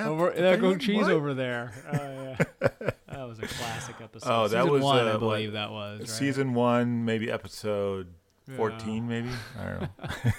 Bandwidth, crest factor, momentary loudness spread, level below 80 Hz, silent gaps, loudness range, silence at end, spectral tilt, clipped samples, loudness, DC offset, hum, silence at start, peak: 16.5 kHz; 20 dB; 13 LU; -56 dBFS; none; 5 LU; 0 s; -6 dB/octave; under 0.1%; -28 LUFS; under 0.1%; none; 0 s; -8 dBFS